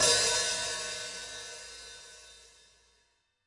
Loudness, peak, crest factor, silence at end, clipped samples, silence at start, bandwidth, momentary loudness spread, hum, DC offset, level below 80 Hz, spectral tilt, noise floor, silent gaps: -30 LUFS; -12 dBFS; 22 dB; 1.05 s; under 0.1%; 0 s; 12 kHz; 24 LU; none; under 0.1%; -64 dBFS; 0.5 dB/octave; -73 dBFS; none